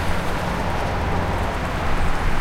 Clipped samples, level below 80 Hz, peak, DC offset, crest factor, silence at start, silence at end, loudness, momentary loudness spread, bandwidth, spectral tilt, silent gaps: under 0.1%; -24 dBFS; -8 dBFS; 2%; 12 dB; 0 s; 0 s; -24 LUFS; 1 LU; 15 kHz; -5.5 dB/octave; none